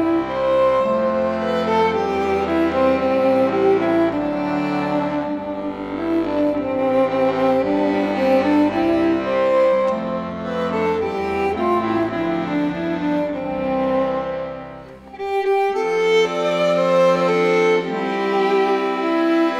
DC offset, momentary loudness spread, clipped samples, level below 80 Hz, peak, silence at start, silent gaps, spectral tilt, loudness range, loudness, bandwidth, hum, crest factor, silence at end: under 0.1%; 8 LU; under 0.1%; -50 dBFS; -6 dBFS; 0 s; none; -6.5 dB/octave; 4 LU; -19 LUFS; 11 kHz; none; 12 dB; 0 s